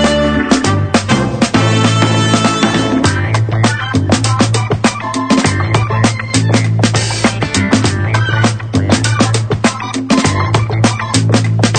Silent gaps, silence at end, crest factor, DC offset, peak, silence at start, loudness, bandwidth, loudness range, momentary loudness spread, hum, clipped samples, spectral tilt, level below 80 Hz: none; 0 s; 12 dB; under 0.1%; 0 dBFS; 0 s; -12 LUFS; 9.4 kHz; 1 LU; 3 LU; none; under 0.1%; -5 dB/octave; -34 dBFS